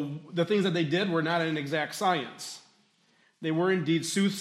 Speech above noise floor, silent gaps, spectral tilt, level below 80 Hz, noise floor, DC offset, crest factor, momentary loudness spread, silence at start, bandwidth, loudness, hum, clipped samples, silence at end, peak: 39 dB; none; -5 dB/octave; -78 dBFS; -66 dBFS; under 0.1%; 16 dB; 11 LU; 0 s; 15.5 kHz; -28 LUFS; none; under 0.1%; 0 s; -12 dBFS